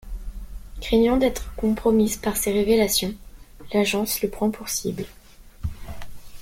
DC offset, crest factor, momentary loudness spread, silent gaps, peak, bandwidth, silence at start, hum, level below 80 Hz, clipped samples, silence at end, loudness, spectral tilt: under 0.1%; 16 dB; 21 LU; none; -8 dBFS; 16.5 kHz; 0.05 s; none; -38 dBFS; under 0.1%; 0 s; -22 LUFS; -4 dB/octave